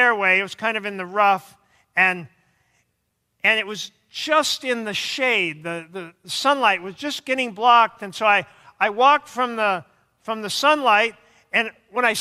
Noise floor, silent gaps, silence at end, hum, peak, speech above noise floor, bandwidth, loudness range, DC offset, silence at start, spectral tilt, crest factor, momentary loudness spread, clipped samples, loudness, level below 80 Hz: -73 dBFS; none; 0 s; none; -4 dBFS; 52 dB; 15.5 kHz; 3 LU; under 0.1%; 0 s; -2.5 dB/octave; 18 dB; 14 LU; under 0.1%; -20 LUFS; -72 dBFS